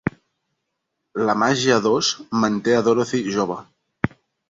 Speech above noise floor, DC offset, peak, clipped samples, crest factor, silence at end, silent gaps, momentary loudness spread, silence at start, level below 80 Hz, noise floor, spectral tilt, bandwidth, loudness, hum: 58 dB; under 0.1%; -2 dBFS; under 0.1%; 20 dB; 0.4 s; none; 10 LU; 0.05 s; -54 dBFS; -77 dBFS; -4.5 dB/octave; 7.8 kHz; -20 LUFS; none